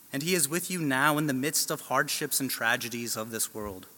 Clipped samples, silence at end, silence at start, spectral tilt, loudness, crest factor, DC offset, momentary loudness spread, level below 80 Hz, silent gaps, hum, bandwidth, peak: under 0.1%; 0.05 s; 0.05 s; -3 dB/octave; -28 LUFS; 22 dB; under 0.1%; 7 LU; -64 dBFS; none; none; 17.5 kHz; -8 dBFS